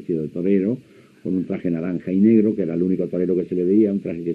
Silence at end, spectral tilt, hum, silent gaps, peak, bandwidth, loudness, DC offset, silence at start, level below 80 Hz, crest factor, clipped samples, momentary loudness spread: 0 s; -11 dB/octave; none; none; -6 dBFS; 4.4 kHz; -21 LUFS; under 0.1%; 0 s; -62 dBFS; 16 dB; under 0.1%; 9 LU